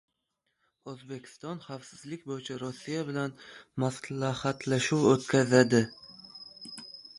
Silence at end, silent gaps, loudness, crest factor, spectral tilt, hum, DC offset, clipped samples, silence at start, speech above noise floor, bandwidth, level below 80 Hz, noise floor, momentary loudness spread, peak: 0.1 s; none; -29 LUFS; 24 dB; -5.5 dB/octave; none; under 0.1%; under 0.1%; 0.85 s; 52 dB; 11.5 kHz; -68 dBFS; -81 dBFS; 22 LU; -6 dBFS